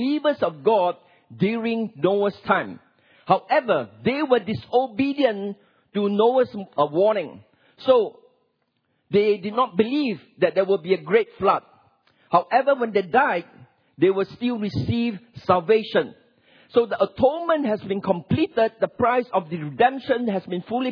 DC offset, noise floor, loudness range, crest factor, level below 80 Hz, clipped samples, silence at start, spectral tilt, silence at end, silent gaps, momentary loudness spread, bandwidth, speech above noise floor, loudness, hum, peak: under 0.1%; -71 dBFS; 1 LU; 20 dB; -60 dBFS; under 0.1%; 0 s; -8.5 dB/octave; 0 s; none; 7 LU; 5.4 kHz; 50 dB; -22 LUFS; none; -4 dBFS